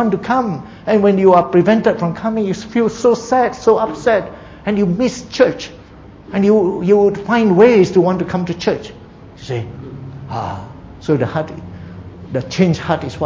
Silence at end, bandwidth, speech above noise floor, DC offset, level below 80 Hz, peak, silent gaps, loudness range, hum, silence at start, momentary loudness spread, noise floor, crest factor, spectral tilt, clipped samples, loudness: 0 s; 7.8 kHz; 24 dB; under 0.1%; -44 dBFS; 0 dBFS; none; 9 LU; none; 0 s; 20 LU; -38 dBFS; 16 dB; -7 dB/octave; under 0.1%; -15 LUFS